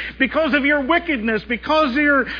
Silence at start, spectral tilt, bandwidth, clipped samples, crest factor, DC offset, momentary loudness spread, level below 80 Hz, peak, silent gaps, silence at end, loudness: 0 s; -6 dB/octave; 5.4 kHz; under 0.1%; 16 dB; under 0.1%; 5 LU; -42 dBFS; -4 dBFS; none; 0 s; -18 LUFS